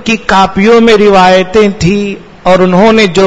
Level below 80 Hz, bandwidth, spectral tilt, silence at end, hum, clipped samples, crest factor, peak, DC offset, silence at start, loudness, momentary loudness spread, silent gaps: -32 dBFS; 11 kHz; -5.5 dB/octave; 0 s; none; 4%; 6 dB; 0 dBFS; under 0.1%; 0 s; -6 LUFS; 7 LU; none